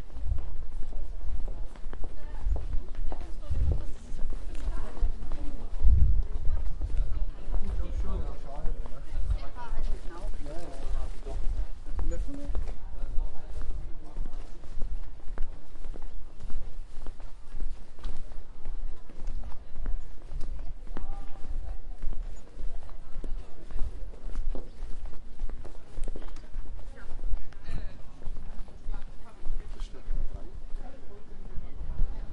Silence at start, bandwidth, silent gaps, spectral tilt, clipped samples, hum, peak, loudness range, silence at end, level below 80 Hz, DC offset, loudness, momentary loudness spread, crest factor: 0 s; 2.3 kHz; none; -7 dB/octave; under 0.1%; none; -6 dBFS; 11 LU; 0 s; -32 dBFS; under 0.1%; -39 LUFS; 11 LU; 18 dB